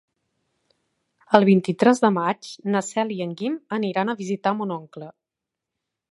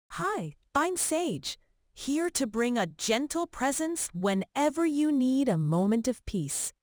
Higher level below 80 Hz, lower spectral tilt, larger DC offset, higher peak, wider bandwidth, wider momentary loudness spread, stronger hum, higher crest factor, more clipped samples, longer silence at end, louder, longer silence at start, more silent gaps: second, -66 dBFS vs -56 dBFS; first, -6 dB/octave vs -4.5 dB/octave; neither; first, 0 dBFS vs -12 dBFS; second, 11.5 kHz vs over 20 kHz; first, 13 LU vs 6 LU; neither; first, 24 dB vs 16 dB; neither; first, 1 s vs 0.1 s; first, -22 LUFS vs -29 LUFS; first, 1.3 s vs 0.1 s; neither